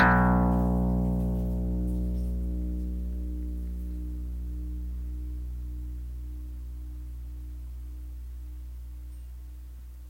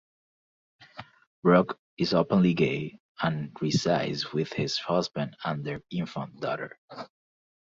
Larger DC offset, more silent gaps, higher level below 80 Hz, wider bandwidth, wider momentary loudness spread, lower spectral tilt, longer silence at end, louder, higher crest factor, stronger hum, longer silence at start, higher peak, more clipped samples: neither; second, none vs 1.27-1.43 s, 1.79-1.97 s, 3.00-3.15 s, 6.78-6.88 s; first, -32 dBFS vs -62 dBFS; first, 16 kHz vs 7.8 kHz; second, 17 LU vs 21 LU; first, -9 dB/octave vs -6 dB/octave; second, 0 s vs 0.7 s; second, -32 LUFS vs -28 LUFS; about the same, 22 dB vs 22 dB; first, 60 Hz at -35 dBFS vs none; second, 0 s vs 0.8 s; about the same, -8 dBFS vs -8 dBFS; neither